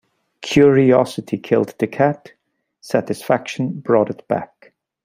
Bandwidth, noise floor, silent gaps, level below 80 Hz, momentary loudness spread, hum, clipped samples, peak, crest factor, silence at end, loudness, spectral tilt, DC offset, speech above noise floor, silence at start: 16 kHz; -53 dBFS; none; -58 dBFS; 12 LU; none; under 0.1%; -2 dBFS; 16 dB; 0.6 s; -18 LUFS; -6.5 dB/octave; under 0.1%; 36 dB; 0.4 s